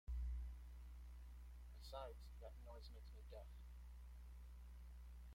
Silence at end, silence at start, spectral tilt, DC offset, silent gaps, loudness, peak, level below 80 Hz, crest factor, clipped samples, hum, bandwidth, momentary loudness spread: 0 s; 0.05 s; -6 dB/octave; under 0.1%; none; -58 LUFS; -40 dBFS; -54 dBFS; 14 dB; under 0.1%; 60 Hz at -55 dBFS; 16 kHz; 9 LU